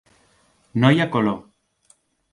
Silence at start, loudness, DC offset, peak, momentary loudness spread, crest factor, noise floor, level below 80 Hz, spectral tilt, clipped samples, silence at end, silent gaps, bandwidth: 0.75 s; -20 LUFS; under 0.1%; -2 dBFS; 13 LU; 20 dB; -60 dBFS; -60 dBFS; -7.5 dB/octave; under 0.1%; 0.95 s; none; 11.5 kHz